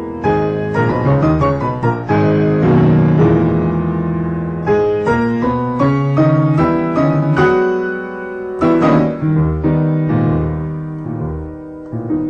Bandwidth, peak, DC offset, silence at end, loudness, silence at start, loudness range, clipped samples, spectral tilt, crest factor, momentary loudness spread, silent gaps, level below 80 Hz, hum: 6.6 kHz; -2 dBFS; under 0.1%; 0 s; -15 LUFS; 0 s; 2 LU; under 0.1%; -9.5 dB/octave; 12 dB; 12 LU; none; -34 dBFS; none